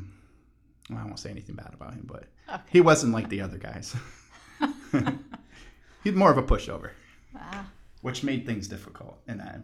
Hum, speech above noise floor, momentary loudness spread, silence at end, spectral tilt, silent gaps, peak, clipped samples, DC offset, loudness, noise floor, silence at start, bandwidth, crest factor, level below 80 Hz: none; 34 dB; 25 LU; 0 s; -5.5 dB/octave; none; -6 dBFS; under 0.1%; under 0.1%; -26 LUFS; -61 dBFS; 0 s; 13 kHz; 22 dB; -42 dBFS